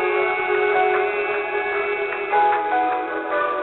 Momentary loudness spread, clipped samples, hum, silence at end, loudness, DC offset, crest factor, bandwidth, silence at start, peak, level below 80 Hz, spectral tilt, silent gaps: 5 LU; under 0.1%; none; 0 s; -21 LUFS; under 0.1%; 14 dB; 4.2 kHz; 0 s; -8 dBFS; -60 dBFS; -0.5 dB/octave; none